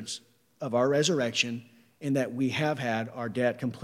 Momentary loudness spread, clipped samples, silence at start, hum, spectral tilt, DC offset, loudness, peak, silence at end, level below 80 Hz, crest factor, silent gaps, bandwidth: 13 LU; under 0.1%; 0 s; none; -4.5 dB/octave; under 0.1%; -28 LUFS; -10 dBFS; 0 s; -78 dBFS; 18 dB; none; 15.5 kHz